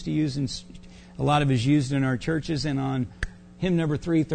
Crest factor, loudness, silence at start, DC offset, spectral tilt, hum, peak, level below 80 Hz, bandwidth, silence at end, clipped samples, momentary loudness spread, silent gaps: 16 dB; -25 LUFS; 0 s; under 0.1%; -6.5 dB/octave; none; -10 dBFS; -44 dBFS; 9.4 kHz; 0 s; under 0.1%; 12 LU; none